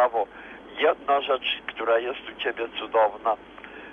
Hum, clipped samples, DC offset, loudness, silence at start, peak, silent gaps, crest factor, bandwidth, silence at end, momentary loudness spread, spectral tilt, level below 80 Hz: none; under 0.1%; under 0.1%; -26 LUFS; 0 s; -8 dBFS; none; 18 dB; 5.4 kHz; 0 s; 13 LU; -4.5 dB/octave; -62 dBFS